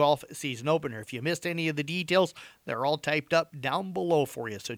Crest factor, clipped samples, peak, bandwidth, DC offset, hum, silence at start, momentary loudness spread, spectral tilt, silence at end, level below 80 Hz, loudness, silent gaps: 18 dB; under 0.1%; -10 dBFS; over 20 kHz; under 0.1%; none; 0 s; 8 LU; -5 dB/octave; 0 s; -70 dBFS; -29 LUFS; none